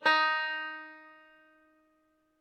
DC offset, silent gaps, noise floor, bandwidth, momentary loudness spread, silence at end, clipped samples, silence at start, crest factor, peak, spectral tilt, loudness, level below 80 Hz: under 0.1%; none; -72 dBFS; 12 kHz; 24 LU; 1.3 s; under 0.1%; 0 s; 22 dB; -12 dBFS; -1.5 dB/octave; -29 LUFS; -84 dBFS